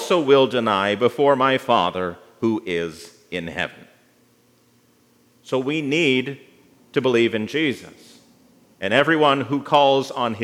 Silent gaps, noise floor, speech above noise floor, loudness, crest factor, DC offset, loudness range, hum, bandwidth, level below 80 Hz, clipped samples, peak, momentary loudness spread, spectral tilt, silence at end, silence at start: none; -58 dBFS; 39 dB; -20 LUFS; 20 dB; under 0.1%; 9 LU; none; 15 kHz; -68 dBFS; under 0.1%; 0 dBFS; 14 LU; -5 dB/octave; 0 s; 0 s